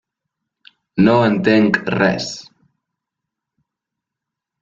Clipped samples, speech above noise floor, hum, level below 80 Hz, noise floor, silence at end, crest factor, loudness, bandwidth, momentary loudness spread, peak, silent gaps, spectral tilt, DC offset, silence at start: under 0.1%; 69 dB; none; -54 dBFS; -83 dBFS; 2.2 s; 18 dB; -15 LUFS; 7.8 kHz; 14 LU; -2 dBFS; none; -6 dB/octave; under 0.1%; 0.95 s